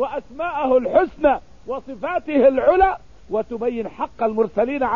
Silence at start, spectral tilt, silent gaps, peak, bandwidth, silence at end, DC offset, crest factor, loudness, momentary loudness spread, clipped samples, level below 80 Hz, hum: 0 s; -7.5 dB/octave; none; -4 dBFS; 7 kHz; 0 s; 0.6%; 16 dB; -20 LUFS; 12 LU; under 0.1%; -44 dBFS; none